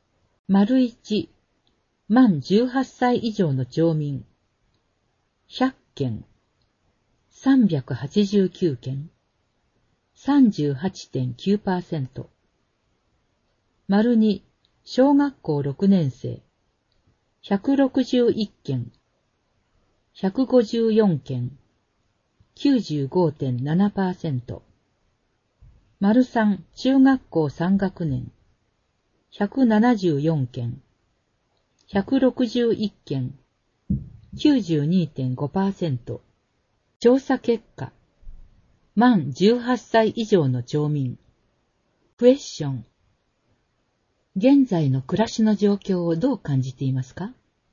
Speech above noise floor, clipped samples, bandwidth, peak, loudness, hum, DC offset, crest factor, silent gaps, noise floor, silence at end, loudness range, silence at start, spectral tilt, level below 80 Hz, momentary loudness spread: 49 dB; under 0.1%; 7.4 kHz; -4 dBFS; -22 LUFS; none; under 0.1%; 20 dB; 36.96-37.00 s, 42.13-42.17 s; -70 dBFS; 0.4 s; 4 LU; 0.5 s; -7.5 dB/octave; -54 dBFS; 14 LU